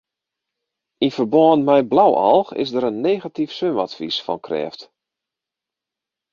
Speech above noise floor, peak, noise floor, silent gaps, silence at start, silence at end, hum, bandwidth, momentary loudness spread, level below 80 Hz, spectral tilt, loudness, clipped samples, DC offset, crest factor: 68 dB; -2 dBFS; -86 dBFS; none; 1 s; 1.5 s; none; 7.2 kHz; 11 LU; -62 dBFS; -7 dB/octave; -18 LUFS; under 0.1%; under 0.1%; 18 dB